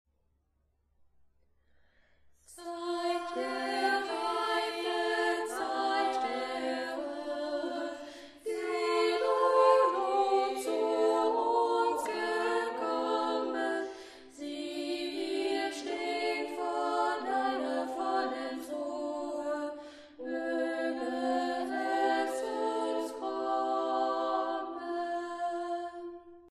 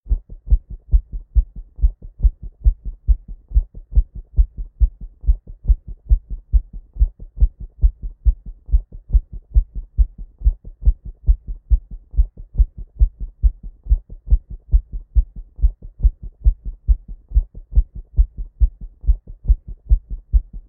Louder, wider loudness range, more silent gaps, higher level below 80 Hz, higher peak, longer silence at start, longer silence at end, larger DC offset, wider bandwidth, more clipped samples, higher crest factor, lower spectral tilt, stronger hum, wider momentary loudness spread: second, -32 LUFS vs -24 LUFS; first, 7 LU vs 0 LU; neither; second, -74 dBFS vs -18 dBFS; second, -14 dBFS vs -2 dBFS; first, 2.5 s vs 0.05 s; about the same, 0 s vs 0.1 s; neither; first, 13 kHz vs 0.7 kHz; neither; about the same, 18 dB vs 16 dB; second, -2 dB/octave vs -18 dB/octave; neither; first, 10 LU vs 1 LU